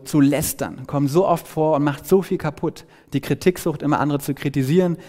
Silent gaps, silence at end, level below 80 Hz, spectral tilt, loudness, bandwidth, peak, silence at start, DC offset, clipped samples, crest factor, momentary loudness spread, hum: none; 0 s; -48 dBFS; -6.5 dB/octave; -21 LUFS; 16.5 kHz; -4 dBFS; 0 s; under 0.1%; under 0.1%; 16 dB; 9 LU; none